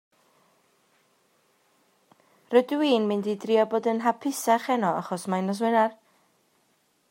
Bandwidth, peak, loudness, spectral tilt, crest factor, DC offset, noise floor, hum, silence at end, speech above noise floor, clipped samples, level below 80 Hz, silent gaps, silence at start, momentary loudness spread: 16 kHz; -6 dBFS; -25 LUFS; -5 dB/octave; 20 dB; under 0.1%; -68 dBFS; none; 1.2 s; 44 dB; under 0.1%; -82 dBFS; none; 2.5 s; 5 LU